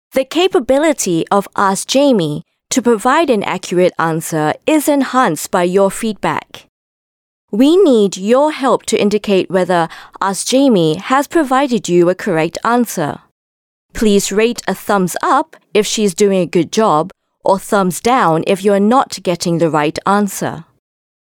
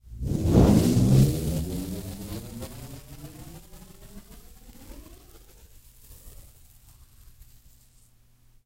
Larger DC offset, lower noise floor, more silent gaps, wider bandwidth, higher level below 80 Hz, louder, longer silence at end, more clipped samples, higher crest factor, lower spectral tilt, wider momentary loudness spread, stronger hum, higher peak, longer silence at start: neither; first, under -90 dBFS vs -58 dBFS; first, 6.69-7.48 s, 13.31-13.89 s vs none; first, 19 kHz vs 16 kHz; second, -46 dBFS vs -38 dBFS; first, -14 LUFS vs -23 LUFS; second, 0.7 s vs 2.35 s; neither; second, 12 dB vs 22 dB; second, -4.5 dB/octave vs -7 dB/octave; second, 7 LU vs 29 LU; neither; about the same, -2 dBFS vs -4 dBFS; about the same, 0.15 s vs 0.1 s